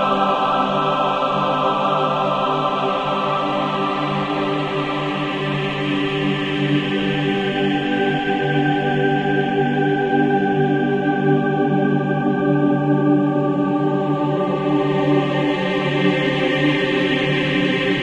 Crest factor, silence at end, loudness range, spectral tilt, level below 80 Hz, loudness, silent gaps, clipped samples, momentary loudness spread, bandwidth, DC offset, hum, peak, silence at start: 14 dB; 0 s; 3 LU; -7 dB/octave; -52 dBFS; -19 LUFS; none; under 0.1%; 3 LU; 8.8 kHz; under 0.1%; none; -6 dBFS; 0 s